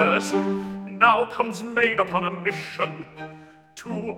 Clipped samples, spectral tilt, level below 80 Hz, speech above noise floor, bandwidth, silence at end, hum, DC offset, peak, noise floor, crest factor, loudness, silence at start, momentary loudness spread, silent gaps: under 0.1%; -5 dB/octave; -62 dBFS; 22 dB; 16 kHz; 0 s; none; under 0.1%; -2 dBFS; -45 dBFS; 22 dB; -23 LUFS; 0 s; 20 LU; none